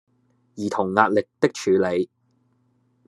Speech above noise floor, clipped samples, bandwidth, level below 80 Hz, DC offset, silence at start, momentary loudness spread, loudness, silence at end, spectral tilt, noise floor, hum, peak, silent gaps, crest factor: 44 dB; under 0.1%; 12 kHz; -72 dBFS; under 0.1%; 0.55 s; 10 LU; -22 LUFS; 1.05 s; -5.5 dB/octave; -65 dBFS; none; 0 dBFS; none; 24 dB